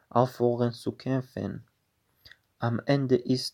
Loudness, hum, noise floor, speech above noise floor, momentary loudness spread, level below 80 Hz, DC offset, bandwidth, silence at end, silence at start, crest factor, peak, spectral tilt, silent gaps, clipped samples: -28 LUFS; none; -73 dBFS; 46 dB; 11 LU; -68 dBFS; under 0.1%; 16.5 kHz; 0.05 s; 0.15 s; 22 dB; -6 dBFS; -7 dB/octave; none; under 0.1%